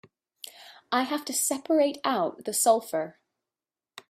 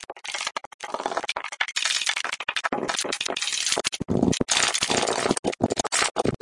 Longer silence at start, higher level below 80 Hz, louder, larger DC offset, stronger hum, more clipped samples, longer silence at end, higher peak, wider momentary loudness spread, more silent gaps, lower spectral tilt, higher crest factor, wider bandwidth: first, 0.6 s vs 0 s; second, -78 dBFS vs -52 dBFS; about the same, -26 LUFS vs -24 LUFS; neither; neither; neither; first, 1 s vs 0.05 s; second, -8 dBFS vs -2 dBFS; first, 20 LU vs 9 LU; second, none vs 0.66-0.79 s, 5.39-5.43 s, 6.11-6.15 s; about the same, -2 dB/octave vs -2 dB/octave; about the same, 20 dB vs 24 dB; first, 16 kHz vs 11.5 kHz